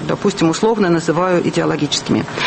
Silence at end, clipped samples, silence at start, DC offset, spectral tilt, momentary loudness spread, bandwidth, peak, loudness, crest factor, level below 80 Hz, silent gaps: 0 s; under 0.1%; 0 s; under 0.1%; -5 dB/octave; 3 LU; 8.8 kHz; -4 dBFS; -16 LUFS; 12 dB; -48 dBFS; none